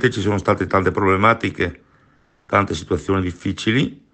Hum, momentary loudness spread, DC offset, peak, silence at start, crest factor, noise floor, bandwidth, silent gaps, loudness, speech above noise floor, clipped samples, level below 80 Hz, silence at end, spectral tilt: none; 8 LU; under 0.1%; 0 dBFS; 0 s; 18 dB; -57 dBFS; 8.8 kHz; none; -19 LUFS; 38 dB; under 0.1%; -44 dBFS; 0.2 s; -6 dB/octave